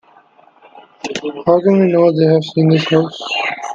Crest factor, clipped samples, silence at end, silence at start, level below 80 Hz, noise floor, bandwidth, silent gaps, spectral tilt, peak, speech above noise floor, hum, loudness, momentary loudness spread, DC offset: 14 dB; under 0.1%; 0 s; 0.75 s; -60 dBFS; -48 dBFS; 7.6 kHz; none; -6.5 dB/octave; 0 dBFS; 35 dB; none; -14 LUFS; 12 LU; under 0.1%